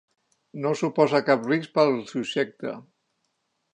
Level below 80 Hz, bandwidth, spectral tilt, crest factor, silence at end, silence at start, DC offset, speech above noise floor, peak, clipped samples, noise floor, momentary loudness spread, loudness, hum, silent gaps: -78 dBFS; 9.6 kHz; -6 dB/octave; 20 dB; 0.9 s; 0.55 s; under 0.1%; 51 dB; -6 dBFS; under 0.1%; -75 dBFS; 14 LU; -24 LUFS; none; none